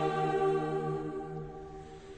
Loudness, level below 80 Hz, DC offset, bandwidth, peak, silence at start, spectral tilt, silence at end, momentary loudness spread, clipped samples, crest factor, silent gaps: -33 LUFS; -58 dBFS; under 0.1%; 9 kHz; -18 dBFS; 0 s; -7.5 dB/octave; 0 s; 17 LU; under 0.1%; 14 dB; none